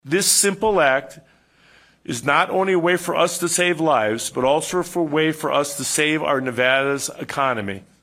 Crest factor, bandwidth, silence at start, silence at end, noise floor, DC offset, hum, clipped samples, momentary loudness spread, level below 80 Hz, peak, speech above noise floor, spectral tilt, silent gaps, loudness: 18 dB; 16 kHz; 0.05 s; 0.25 s; -54 dBFS; under 0.1%; none; under 0.1%; 8 LU; -56 dBFS; -2 dBFS; 34 dB; -3 dB/octave; none; -19 LUFS